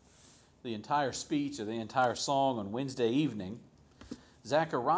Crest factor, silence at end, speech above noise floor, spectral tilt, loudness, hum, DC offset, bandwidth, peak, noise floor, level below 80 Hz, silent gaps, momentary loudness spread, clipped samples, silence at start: 18 dB; 0 s; 29 dB; -5 dB/octave; -33 LUFS; none; under 0.1%; 8 kHz; -16 dBFS; -61 dBFS; -66 dBFS; none; 18 LU; under 0.1%; 0.65 s